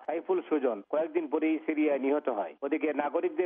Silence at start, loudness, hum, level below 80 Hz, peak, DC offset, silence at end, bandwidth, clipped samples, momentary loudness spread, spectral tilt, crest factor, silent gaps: 0 s; -30 LUFS; none; -90 dBFS; -14 dBFS; under 0.1%; 0 s; 3.7 kHz; under 0.1%; 4 LU; -3.5 dB/octave; 16 dB; none